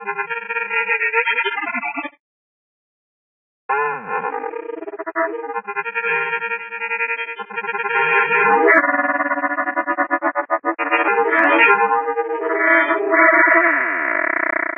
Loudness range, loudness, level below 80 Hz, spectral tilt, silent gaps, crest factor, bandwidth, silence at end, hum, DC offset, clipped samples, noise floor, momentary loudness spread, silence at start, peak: 11 LU; -17 LUFS; -76 dBFS; -6.5 dB/octave; 2.20-3.69 s; 18 dB; 3.7 kHz; 0 s; none; under 0.1%; under 0.1%; under -90 dBFS; 13 LU; 0 s; -2 dBFS